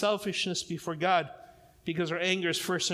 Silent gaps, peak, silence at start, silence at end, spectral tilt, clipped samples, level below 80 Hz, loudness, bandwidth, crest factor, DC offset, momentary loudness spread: none; -14 dBFS; 0 s; 0 s; -3.5 dB/octave; under 0.1%; -68 dBFS; -30 LUFS; 16 kHz; 18 dB; under 0.1%; 9 LU